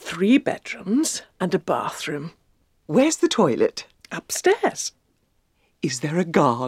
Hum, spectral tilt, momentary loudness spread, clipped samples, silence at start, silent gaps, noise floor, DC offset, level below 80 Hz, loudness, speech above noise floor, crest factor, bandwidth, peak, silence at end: none; -4.5 dB/octave; 12 LU; under 0.1%; 0 s; none; -66 dBFS; under 0.1%; -64 dBFS; -22 LUFS; 45 dB; 20 dB; 16 kHz; -2 dBFS; 0 s